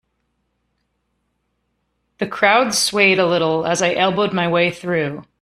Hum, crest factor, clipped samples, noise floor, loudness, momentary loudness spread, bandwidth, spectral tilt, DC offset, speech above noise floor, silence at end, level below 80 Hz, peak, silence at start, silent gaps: none; 18 dB; under 0.1%; -70 dBFS; -17 LUFS; 8 LU; 14 kHz; -3.5 dB/octave; under 0.1%; 53 dB; 0.2 s; -58 dBFS; 0 dBFS; 2.2 s; none